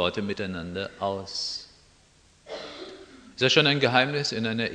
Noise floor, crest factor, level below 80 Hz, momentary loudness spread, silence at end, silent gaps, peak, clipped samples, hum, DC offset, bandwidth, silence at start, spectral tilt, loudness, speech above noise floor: -59 dBFS; 24 dB; -60 dBFS; 21 LU; 0 s; none; -4 dBFS; under 0.1%; none; under 0.1%; 10 kHz; 0 s; -4 dB/octave; -25 LUFS; 33 dB